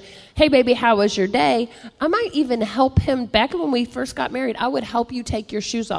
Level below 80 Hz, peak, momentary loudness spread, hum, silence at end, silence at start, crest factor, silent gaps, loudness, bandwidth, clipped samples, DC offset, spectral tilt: -40 dBFS; -2 dBFS; 9 LU; none; 0 s; 0 s; 18 dB; none; -20 LUFS; 11 kHz; under 0.1%; under 0.1%; -5 dB/octave